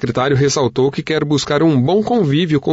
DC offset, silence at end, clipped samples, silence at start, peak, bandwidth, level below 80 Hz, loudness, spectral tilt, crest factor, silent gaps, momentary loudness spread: under 0.1%; 0 s; under 0.1%; 0 s; -4 dBFS; 8 kHz; -46 dBFS; -15 LUFS; -6 dB/octave; 10 dB; none; 3 LU